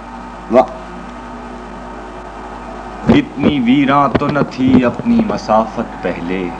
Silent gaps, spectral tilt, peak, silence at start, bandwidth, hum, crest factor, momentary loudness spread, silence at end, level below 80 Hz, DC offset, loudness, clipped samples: none; -7.5 dB/octave; 0 dBFS; 0 s; 8.8 kHz; none; 16 dB; 18 LU; 0 s; -36 dBFS; under 0.1%; -14 LUFS; under 0.1%